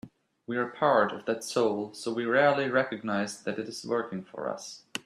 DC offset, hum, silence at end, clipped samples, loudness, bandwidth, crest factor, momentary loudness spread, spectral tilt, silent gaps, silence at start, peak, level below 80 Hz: under 0.1%; none; 0.05 s; under 0.1%; -29 LUFS; 14.5 kHz; 20 dB; 12 LU; -4.5 dB/octave; none; 0.05 s; -10 dBFS; -74 dBFS